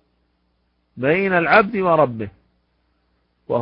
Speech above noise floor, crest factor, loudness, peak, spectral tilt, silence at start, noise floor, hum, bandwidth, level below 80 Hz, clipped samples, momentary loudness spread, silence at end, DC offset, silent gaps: 50 dB; 20 dB; -17 LUFS; 0 dBFS; -11 dB/octave; 0.95 s; -67 dBFS; none; 5.4 kHz; -56 dBFS; under 0.1%; 13 LU; 0 s; under 0.1%; none